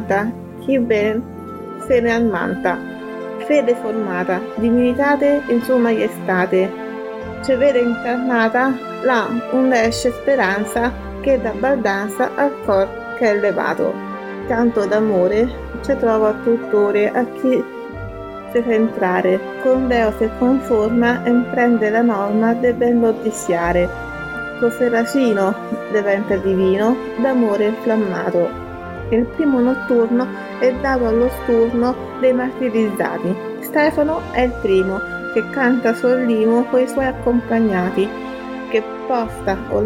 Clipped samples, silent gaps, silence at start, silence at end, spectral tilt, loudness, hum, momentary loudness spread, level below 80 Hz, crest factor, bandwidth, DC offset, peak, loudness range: under 0.1%; none; 0 s; 0 s; -6 dB/octave; -18 LUFS; none; 9 LU; -40 dBFS; 14 dB; 16.5 kHz; under 0.1%; -2 dBFS; 2 LU